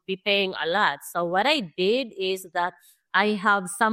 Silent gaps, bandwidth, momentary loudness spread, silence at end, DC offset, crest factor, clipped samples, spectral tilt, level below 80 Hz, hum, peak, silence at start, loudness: none; 16 kHz; 7 LU; 0 s; under 0.1%; 18 dB; under 0.1%; -3.5 dB/octave; -74 dBFS; none; -6 dBFS; 0.1 s; -24 LUFS